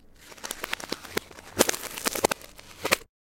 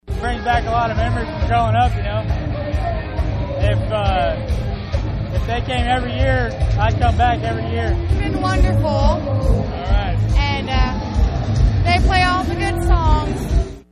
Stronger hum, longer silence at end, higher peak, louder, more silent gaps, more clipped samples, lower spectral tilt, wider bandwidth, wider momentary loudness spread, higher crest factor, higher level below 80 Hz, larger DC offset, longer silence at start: neither; about the same, 0.2 s vs 0.1 s; about the same, 0 dBFS vs -2 dBFS; second, -29 LUFS vs -19 LUFS; neither; neither; second, -1.5 dB/octave vs -6.5 dB/octave; first, 17 kHz vs 11 kHz; first, 14 LU vs 7 LU; first, 30 dB vs 14 dB; second, -56 dBFS vs -22 dBFS; neither; about the same, 0.15 s vs 0.05 s